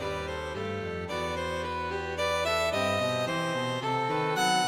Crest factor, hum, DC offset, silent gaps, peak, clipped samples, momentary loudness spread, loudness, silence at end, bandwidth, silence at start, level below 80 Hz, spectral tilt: 14 dB; none; under 0.1%; none; -16 dBFS; under 0.1%; 7 LU; -30 LUFS; 0 s; 16 kHz; 0 s; -50 dBFS; -4 dB/octave